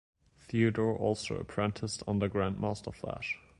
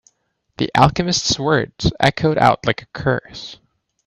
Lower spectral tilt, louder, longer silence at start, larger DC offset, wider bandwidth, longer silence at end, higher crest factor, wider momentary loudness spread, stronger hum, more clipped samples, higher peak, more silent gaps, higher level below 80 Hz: first, -6 dB/octave vs -4.5 dB/octave; second, -33 LUFS vs -17 LUFS; about the same, 0.5 s vs 0.6 s; neither; about the same, 11.5 kHz vs 12.5 kHz; second, 0.2 s vs 0.5 s; about the same, 18 dB vs 18 dB; about the same, 8 LU vs 10 LU; neither; neither; second, -14 dBFS vs 0 dBFS; neither; second, -54 dBFS vs -42 dBFS